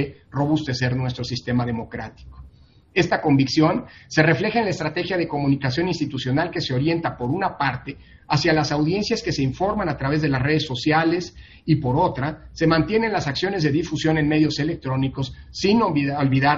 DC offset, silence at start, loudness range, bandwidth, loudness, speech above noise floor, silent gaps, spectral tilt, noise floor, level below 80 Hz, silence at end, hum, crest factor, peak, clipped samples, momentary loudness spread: under 0.1%; 0 s; 2 LU; 7.4 kHz; -22 LUFS; 28 dB; none; -5 dB/octave; -49 dBFS; -46 dBFS; 0 s; none; 20 dB; -2 dBFS; under 0.1%; 9 LU